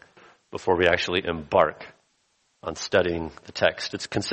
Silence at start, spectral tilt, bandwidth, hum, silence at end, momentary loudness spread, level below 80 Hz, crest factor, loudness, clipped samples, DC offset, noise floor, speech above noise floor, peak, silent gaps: 0.5 s; -4 dB/octave; 8.4 kHz; none; 0 s; 16 LU; -52 dBFS; 22 dB; -24 LUFS; under 0.1%; under 0.1%; -69 dBFS; 44 dB; -4 dBFS; none